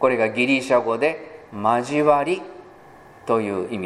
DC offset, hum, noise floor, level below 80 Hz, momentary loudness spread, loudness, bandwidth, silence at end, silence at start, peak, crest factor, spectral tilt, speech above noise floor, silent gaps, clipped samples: under 0.1%; none; -46 dBFS; -64 dBFS; 16 LU; -21 LUFS; 12 kHz; 0 s; 0 s; -2 dBFS; 18 dB; -5.5 dB/octave; 26 dB; none; under 0.1%